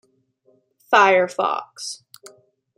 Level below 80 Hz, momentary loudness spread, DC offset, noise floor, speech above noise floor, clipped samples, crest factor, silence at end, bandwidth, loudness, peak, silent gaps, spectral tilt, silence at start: -80 dBFS; 18 LU; under 0.1%; -62 dBFS; 43 dB; under 0.1%; 20 dB; 0.85 s; 15.5 kHz; -18 LUFS; -2 dBFS; none; -2.5 dB/octave; 0.9 s